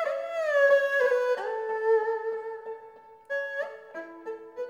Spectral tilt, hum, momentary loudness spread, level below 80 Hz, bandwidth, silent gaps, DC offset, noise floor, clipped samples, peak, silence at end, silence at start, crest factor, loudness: -2 dB/octave; none; 19 LU; -84 dBFS; 14.5 kHz; none; under 0.1%; -50 dBFS; under 0.1%; -14 dBFS; 0 s; 0 s; 16 dB; -27 LUFS